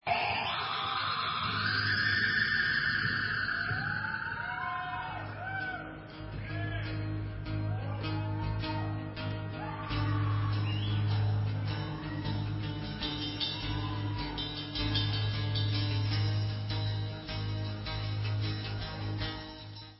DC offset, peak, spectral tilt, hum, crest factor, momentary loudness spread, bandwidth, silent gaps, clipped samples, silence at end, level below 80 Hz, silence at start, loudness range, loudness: under 0.1%; -18 dBFS; -9 dB/octave; none; 16 dB; 9 LU; 5.8 kHz; none; under 0.1%; 0 s; -48 dBFS; 0.05 s; 7 LU; -33 LUFS